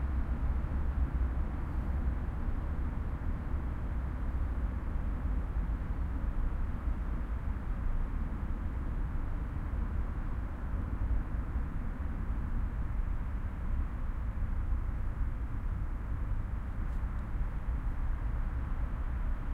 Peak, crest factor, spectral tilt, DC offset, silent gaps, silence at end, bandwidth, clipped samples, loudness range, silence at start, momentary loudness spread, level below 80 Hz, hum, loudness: -20 dBFS; 12 dB; -9 dB/octave; under 0.1%; none; 0 s; 3.9 kHz; under 0.1%; 2 LU; 0 s; 3 LU; -34 dBFS; none; -38 LUFS